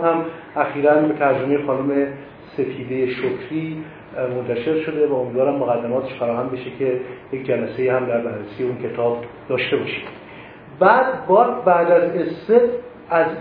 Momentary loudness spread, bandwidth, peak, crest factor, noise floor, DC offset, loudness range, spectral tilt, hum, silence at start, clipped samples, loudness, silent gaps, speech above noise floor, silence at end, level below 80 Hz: 13 LU; 5 kHz; 0 dBFS; 20 dB; -39 dBFS; under 0.1%; 6 LU; -10 dB/octave; none; 0 s; under 0.1%; -20 LUFS; none; 20 dB; 0 s; -58 dBFS